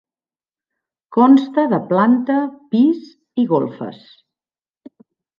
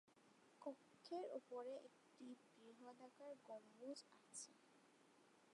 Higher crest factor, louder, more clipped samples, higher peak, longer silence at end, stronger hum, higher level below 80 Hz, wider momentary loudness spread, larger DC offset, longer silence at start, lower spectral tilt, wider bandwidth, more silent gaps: about the same, 16 dB vs 18 dB; first, -16 LUFS vs -58 LUFS; neither; first, -2 dBFS vs -40 dBFS; first, 1.5 s vs 0 s; neither; first, -68 dBFS vs under -90 dBFS; first, 14 LU vs 11 LU; neither; first, 1.1 s vs 0.05 s; first, -9 dB/octave vs -3 dB/octave; second, 5.4 kHz vs 11 kHz; neither